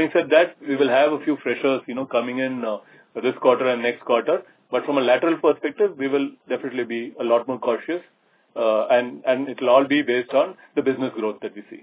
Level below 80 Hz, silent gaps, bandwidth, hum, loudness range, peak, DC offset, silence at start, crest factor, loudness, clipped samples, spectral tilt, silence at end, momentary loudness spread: -78 dBFS; none; 4 kHz; none; 2 LU; -4 dBFS; under 0.1%; 0 s; 18 dB; -22 LUFS; under 0.1%; -9 dB/octave; 0.05 s; 10 LU